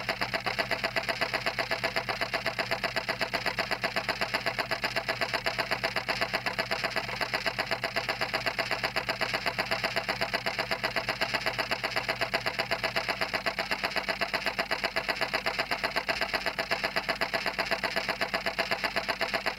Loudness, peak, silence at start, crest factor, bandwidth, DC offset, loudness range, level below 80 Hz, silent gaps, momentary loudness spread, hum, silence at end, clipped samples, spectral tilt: -30 LUFS; -12 dBFS; 0 s; 20 dB; 16 kHz; under 0.1%; 0 LU; -56 dBFS; none; 1 LU; none; 0 s; under 0.1%; -3 dB/octave